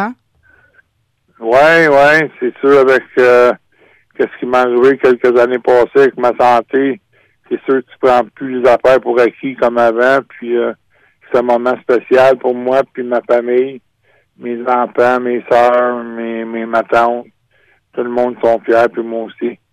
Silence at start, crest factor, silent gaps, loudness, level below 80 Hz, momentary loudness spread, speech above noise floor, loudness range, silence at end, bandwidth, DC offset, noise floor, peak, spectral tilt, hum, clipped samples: 0 s; 10 dB; none; -12 LUFS; -54 dBFS; 13 LU; 50 dB; 5 LU; 0.2 s; 11.5 kHz; under 0.1%; -61 dBFS; -2 dBFS; -6 dB/octave; none; under 0.1%